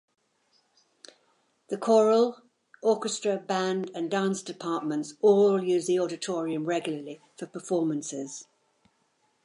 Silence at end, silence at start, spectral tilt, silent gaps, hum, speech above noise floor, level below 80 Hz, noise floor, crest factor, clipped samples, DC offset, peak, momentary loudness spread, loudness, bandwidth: 1.05 s; 1.7 s; -5 dB/octave; none; none; 45 dB; -82 dBFS; -71 dBFS; 18 dB; under 0.1%; under 0.1%; -10 dBFS; 16 LU; -27 LUFS; 11.5 kHz